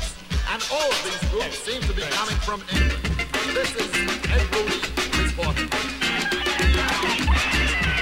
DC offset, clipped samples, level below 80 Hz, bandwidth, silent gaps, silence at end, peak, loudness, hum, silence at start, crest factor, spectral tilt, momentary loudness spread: under 0.1%; under 0.1%; -28 dBFS; 16.5 kHz; none; 0 s; -8 dBFS; -23 LUFS; none; 0 s; 14 dB; -3.5 dB/octave; 6 LU